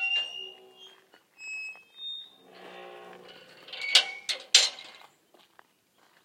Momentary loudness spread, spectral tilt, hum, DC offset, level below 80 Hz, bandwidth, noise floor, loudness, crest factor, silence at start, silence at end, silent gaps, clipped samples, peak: 27 LU; 3 dB/octave; none; under 0.1%; under -90 dBFS; 16.5 kHz; -66 dBFS; -25 LUFS; 32 dB; 0 s; 1.3 s; none; under 0.1%; -2 dBFS